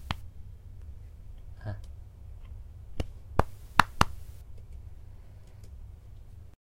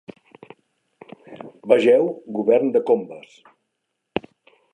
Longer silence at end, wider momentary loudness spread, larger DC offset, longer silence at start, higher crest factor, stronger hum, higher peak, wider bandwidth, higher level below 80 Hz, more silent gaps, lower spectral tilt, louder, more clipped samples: second, 0.15 s vs 0.55 s; about the same, 25 LU vs 25 LU; neither; about the same, 0 s vs 0.1 s; first, 34 dB vs 22 dB; neither; about the same, 0 dBFS vs -2 dBFS; first, 16 kHz vs 9.2 kHz; first, -42 dBFS vs -68 dBFS; neither; second, -4.5 dB/octave vs -6.5 dB/octave; second, -31 LUFS vs -20 LUFS; neither